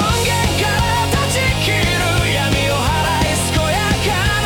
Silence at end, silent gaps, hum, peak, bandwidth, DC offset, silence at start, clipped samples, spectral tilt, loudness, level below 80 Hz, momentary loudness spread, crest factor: 0 s; none; none; -4 dBFS; 18 kHz; under 0.1%; 0 s; under 0.1%; -4 dB/octave; -16 LUFS; -26 dBFS; 1 LU; 12 dB